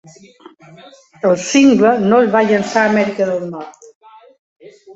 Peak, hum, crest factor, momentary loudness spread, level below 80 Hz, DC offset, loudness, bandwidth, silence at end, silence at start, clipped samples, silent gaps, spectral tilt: 0 dBFS; none; 16 dB; 14 LU; -58 dBFS; under 0.1%; -13 LUFS; 8 kHz; 0 s; 1.25 s; under 0.1%; 3.95-4.01 s, 4.39-4.60 s; -5 dB/octave